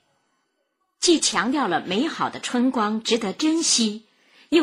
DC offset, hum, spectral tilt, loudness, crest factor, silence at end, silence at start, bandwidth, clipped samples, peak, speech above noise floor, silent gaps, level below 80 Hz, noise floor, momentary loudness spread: under 0.1%; none; -2.5 dB/octave; -22 LUFS; 16 dB; 0 s; 1 s; 14.5 kHz; under 0.1%; -6 dBFS; 51 dB; none; -64 dBFS; -73 dBFS; 7 LU